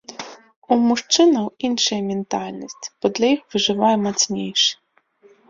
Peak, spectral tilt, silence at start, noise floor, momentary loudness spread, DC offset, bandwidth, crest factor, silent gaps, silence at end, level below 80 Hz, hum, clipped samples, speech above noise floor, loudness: -2 dBFS; -3 dB/octave; 0.1 s; -56 dBFS; 17 LU; under 0.1%; 7.8 kHz; 18 dB; 0.56-0.62 s; 0.75 s; -62 dBFS; none; under 0.1%; 36 dB; -19 LUFS